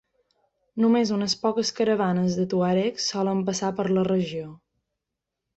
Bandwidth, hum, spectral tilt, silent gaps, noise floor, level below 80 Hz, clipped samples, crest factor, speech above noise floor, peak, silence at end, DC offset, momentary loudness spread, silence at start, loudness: 8.2 kHz; none; -5.5 dB/octave; none; -84 dBFS; -64 dBFS; under 0.1%; 16 dB; 61 dB; -10 dBFS; 1.05 s; under 0.1%; 5 LU; 0.75 s; -24 LUFS